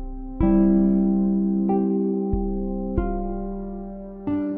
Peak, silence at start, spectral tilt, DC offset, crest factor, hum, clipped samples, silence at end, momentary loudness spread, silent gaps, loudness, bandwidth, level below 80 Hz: -8 dBFS; 0 s; -14 dB/octave; under 0.1%; 14 dB; none; under 0.1%; 0 s; 15 LU; none; -23 LUFS; 2.8 kHz; -32 dBFS